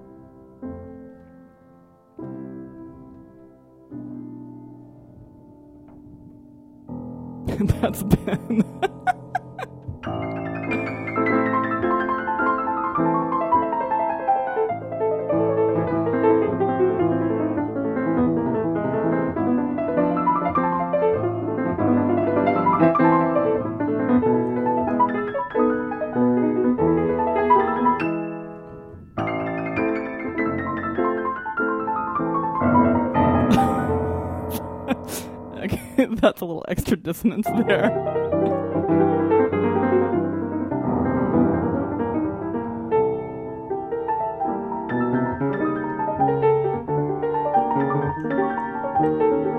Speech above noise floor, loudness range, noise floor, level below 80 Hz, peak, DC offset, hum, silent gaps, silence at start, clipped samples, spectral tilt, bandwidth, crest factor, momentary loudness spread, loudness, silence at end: 31 dB; 15 LU; -52 dBFS; -46 dBFS; -2 dBFS; under 0.1%; none; none; 0 s; under 0.1%; -7.5 dB/octave; 16 kHz; 22 dB; 13 LU; -22 LUFS; 0 s